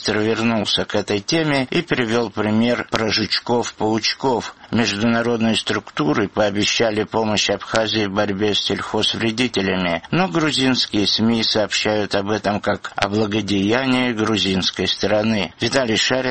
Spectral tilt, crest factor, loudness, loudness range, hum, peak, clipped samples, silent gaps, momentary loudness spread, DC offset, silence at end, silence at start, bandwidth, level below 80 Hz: -4 dB/octave; 18 dB; -19 LUFS; 1 LU; none; 0 dBFS; under 0.1%; none; 4 LU; 0.2%; 0 s; 0 s; 8.8 kHz; -50 dBFS